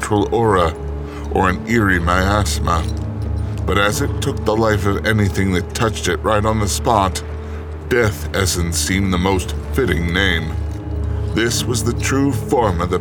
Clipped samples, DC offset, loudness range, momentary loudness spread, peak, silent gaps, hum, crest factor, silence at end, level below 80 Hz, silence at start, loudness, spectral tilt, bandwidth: under 0.1%; under 0.1%; 1 LU; 8 LU; 0 dBFS; none; none; 16 dB; 0 s; -26 dBFS; 0 s; -18 LUFS; -5 dB/octave; 19 kHz